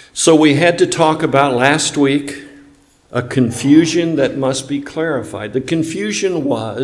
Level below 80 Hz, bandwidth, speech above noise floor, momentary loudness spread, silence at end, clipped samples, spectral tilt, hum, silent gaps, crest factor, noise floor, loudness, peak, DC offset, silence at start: -54 dBFS; 12 kHz; 33 dB; 11 LU; 0 s; under 0.1%; -4.5 dB/octave; none; none; 14 dB; -48 dBFS; -15 LUFS; 0 dBFS; under 0.1%; 0.15 s